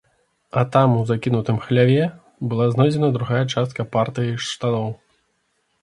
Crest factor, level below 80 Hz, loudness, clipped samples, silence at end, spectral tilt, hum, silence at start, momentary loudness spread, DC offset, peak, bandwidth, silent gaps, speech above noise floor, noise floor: 20 dB; -56 dBFS; -20 LUFS; under 0.1%; 0.85 s; -7 dB/octave; none; 0.55 s; 9 LU; under 0.1%; 0 dBFS; 11 kHz; none; 49 dB; -68 dBFS